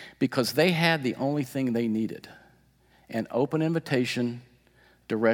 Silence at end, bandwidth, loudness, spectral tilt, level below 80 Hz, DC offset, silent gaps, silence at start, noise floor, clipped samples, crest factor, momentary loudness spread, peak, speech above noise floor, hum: 0 s; 18 kHz; -27 LUFS; -5.5 dB/octave; -68 dBFS; under 0.1%; none; 0 s; -61 dBFS; under 0.1%; 22 dB; 11 LU; -6 dBFS; 35 dB; none